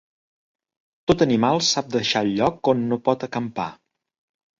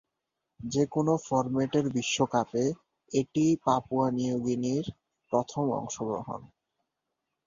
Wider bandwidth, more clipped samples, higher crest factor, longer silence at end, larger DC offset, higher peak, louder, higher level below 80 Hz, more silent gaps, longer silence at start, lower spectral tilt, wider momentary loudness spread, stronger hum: about the same, 7.8 kHz vs 7.6 kHz; neither; about the same, 20 dB vs 20 dB; second, 0.85 s vs 1 s; neither; first, -4 dBFS vs -10 dBFS; first, -21 LUFS vs -29 LUFS; first, -52 dBFS vs -62 dBFS; neither; first, 1.1 s vs 0.6 s; about the same, -4.5 dB/octave vs -5.5 dB/octave; first, 10 LU vs 7 LU; neither